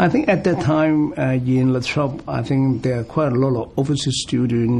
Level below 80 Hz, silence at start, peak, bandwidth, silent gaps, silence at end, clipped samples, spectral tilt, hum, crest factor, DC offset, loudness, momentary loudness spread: -46 dBFS; 0 s; -4 dBFS; 10.5 kHz; none; 0 s; under 0.1%; -6.5 dB/octave; none; 14 dB; under 0.1%; -19 LUFS; 5 LU